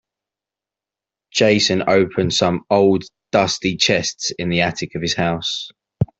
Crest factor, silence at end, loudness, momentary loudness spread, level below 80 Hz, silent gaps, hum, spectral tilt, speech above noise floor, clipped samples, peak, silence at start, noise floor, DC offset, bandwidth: 16 dB; 0.15 s; -18 LUFS; 9 LU; -50 dBFS; none; none; -4 dB/octave; 70 dB; under 0.1%; -2 dBFS; 1.35 s; -88 dBFS; under 0.1%; 8.2 kHz